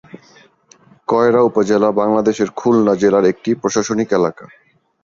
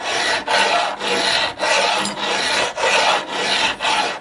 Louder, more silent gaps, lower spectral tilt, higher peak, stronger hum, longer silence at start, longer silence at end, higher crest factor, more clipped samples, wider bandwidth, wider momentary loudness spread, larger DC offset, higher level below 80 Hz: about the same, -15 LUFS vs -17 LUFS; neither; first, -5.5 dB/octave vs -1 dB/octave; about the same, -2 dBFS vs -4 dBFS; neither; first, 0.15 s vs 0 s; first, 0.55 s vs 0 s; about the same, 14 dB vs 16 dB; neither; second, 7.6 kHz vs 11.5 kHz; about the same, 6 LU vs 4 LU; neither; about the same, -56 dBFS vs -56 dBFS